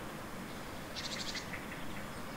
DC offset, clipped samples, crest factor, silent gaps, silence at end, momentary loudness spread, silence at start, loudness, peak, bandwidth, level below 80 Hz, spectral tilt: under 0.1%; under 0.1%; 16 dB; none; 0 s; 6 LU; 0 s; -42 LUFS; -28 dBFS; 16 kHz; -56 dBFS; -3.5 dB/octave